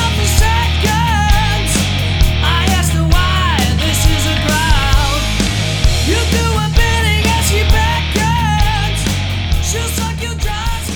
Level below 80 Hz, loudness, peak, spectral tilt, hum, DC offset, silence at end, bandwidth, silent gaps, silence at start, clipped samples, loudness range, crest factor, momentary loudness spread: -16 dBFS; -14 LUFS; 0 dBFS; -4 dB/octave; none; under 0.1%; 0 s; 19 kHz; none; 0 s; under 0.1%; 1 LU; 12 dB; 4 LU